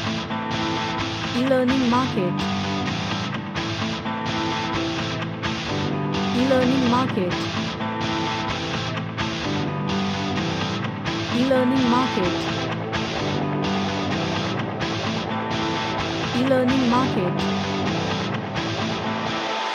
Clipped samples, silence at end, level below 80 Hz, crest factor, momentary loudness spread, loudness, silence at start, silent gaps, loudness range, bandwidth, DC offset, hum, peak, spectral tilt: under 0.1%; 0 s; -50 dBFS; 16 dB; 7 LU; -23 LUFS; 0 s; none; 3 LU; 10.5 kHz; under 0.1%; none; -8 dBFS; -5.5 dB/octave